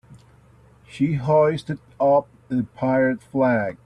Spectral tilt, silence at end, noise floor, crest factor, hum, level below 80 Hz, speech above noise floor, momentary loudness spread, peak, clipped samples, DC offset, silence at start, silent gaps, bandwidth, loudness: -8.5 dB/octave; 0.1 s; -52 dBFS; 14 dB; none; -56 dBFS; 31 dB; 9 LU; -8 dBFS; under 0.1%; under 0.1%; 0.1 s; none; 10.5 kHz; -21 LUFS